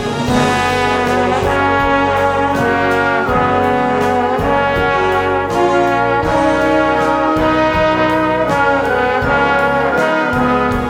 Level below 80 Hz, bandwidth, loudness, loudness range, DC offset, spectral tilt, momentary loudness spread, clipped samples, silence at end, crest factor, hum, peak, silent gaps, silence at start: -34 dBFS; 17.5 kHz; -14 LUFS; 1 LU; under 0.1%; -5.5 dB/octave; 1 LU; under 0.1%; 0 s; 14 dB; none; 0 dBFS; none; 0 s